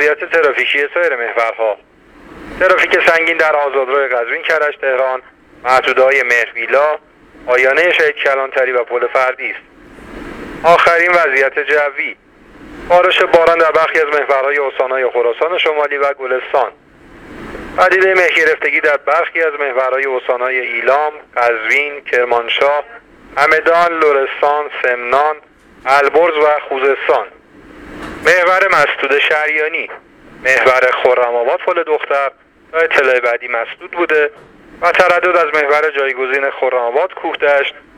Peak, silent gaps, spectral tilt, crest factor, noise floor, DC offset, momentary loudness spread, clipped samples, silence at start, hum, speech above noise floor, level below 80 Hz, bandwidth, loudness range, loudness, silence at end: 0 dBFS; none; -3 dB/octave; 14 dB; -39 dBFS; under 0.1%; 9 LU; under 0.1%; 0 s; none; 26 dB; -50 dBFS; 14.5 kHz; 2 LU; -13 LUFS; 0.2 s